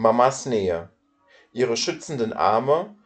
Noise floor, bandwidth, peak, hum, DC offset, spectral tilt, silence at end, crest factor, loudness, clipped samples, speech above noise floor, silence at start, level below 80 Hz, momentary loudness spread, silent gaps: -58 dBFS; 9.2 kHz; -4 dBFS; none; under 0.1%; -4.5 dB/octave; 0.15 s; 18 dB; -23 LUFS; under 0.1%; 36 dB; 0 s; -60 dBFS; 8 LU; none